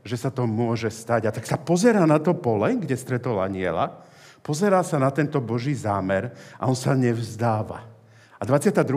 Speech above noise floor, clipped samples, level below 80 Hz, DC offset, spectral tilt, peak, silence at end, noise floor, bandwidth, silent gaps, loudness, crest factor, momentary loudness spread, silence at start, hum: 28 dB; under 0.1%; -68 dBFS; under 0.1%; -6.5 dB/octave; -6 dBFS; 0 s; -51 dBFS; 15.5 kHz; none; -23 LUFS; 18 dB; 9 LU; 0.05 s; none